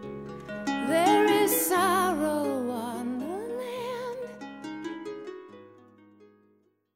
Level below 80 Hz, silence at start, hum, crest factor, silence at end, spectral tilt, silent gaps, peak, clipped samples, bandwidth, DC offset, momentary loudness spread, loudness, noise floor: -68 dBFS; 0 s; none; 18 dB; 1.25 s; -3.5 dB/octave; none; -12 dBFS; under 0.1%; 16 kHz; under 0.1%; 18 LU; -27 LUFS; -67 dBFS